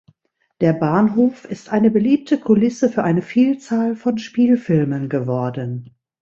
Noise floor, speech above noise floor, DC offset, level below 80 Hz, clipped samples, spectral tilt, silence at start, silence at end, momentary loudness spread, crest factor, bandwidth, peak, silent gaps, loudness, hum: -66 dBFS; 49 dB; under 0.1%; -58 dBFS; under 0.1%; -8 dB/octave; 0.6 s; 0.35 s; 7 LU; 16 dB; 7.6 kHz; -2 dBFS; none; -18 LUFS; none